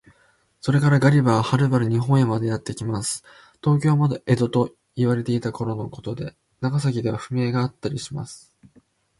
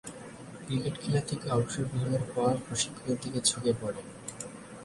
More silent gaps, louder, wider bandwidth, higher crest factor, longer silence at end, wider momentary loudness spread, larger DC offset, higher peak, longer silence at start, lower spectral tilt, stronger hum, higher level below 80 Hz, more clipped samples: neither; first, -22 LUFS vs -31 LUFS; about the same, 11.5 kHz vs 11.5 kHz; about the same, 18 dB vs 20 dB; first, 0.8 s vs 0 s; about the same, 13 LU vs 15 LU; neither; first, -4 dBFS vs -12 dBFS; first, 0.65 s vs 0.05 s; first, -6.5 dB/octave vs -4.5 dB/octave; neither; about the same, -54 dBFS vs -58 dBFS; neither